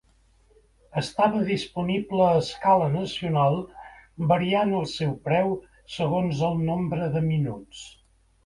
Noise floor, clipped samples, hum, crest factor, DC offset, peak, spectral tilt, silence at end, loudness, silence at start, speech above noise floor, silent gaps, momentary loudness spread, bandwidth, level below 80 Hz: -60 dBFS; under 0.1%; none; 18 dB; under 0.1%; -6 dBFS; -7 dB/octave; 0.55 s; -25 LUFS; 0.95 s; 36 dB; none; 13 LU; 11.5 kHz; -54 dBFS